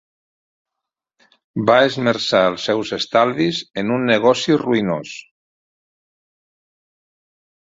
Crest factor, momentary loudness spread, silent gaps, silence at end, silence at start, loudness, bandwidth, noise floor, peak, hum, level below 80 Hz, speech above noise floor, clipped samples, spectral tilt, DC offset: 20 dB; 9 LU; none; 2.55 s; 1.55 s; -17 LUFS; 7.8 kHz; -84 dBFS; -2 dBFS; none; -60 dBFS; 66 dB; under 0.1%; -5 dB/octave; under 0.1%